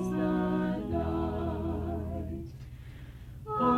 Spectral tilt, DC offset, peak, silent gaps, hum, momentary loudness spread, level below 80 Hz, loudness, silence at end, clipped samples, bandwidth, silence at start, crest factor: -8.5 dB/octave; under 0.1%; -14 dBFS; none; 60 Hz at -45 dBFS; 17 LU; -44 dBFS; -33 LUFS; 0 s; under 0.1%; 14.5 kHz; 0 s; 18 dB